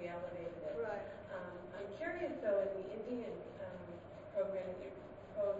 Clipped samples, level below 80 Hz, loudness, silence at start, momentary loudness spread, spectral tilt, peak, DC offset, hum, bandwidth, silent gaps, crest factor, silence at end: under 0.1%; -68 dBFS; -43 LUFS; 0 s; 11 LU; -5.5 dB/octave; -26 dBFS; under 0.1%; none; 7.6 kHz; none; 16 dB; 0 s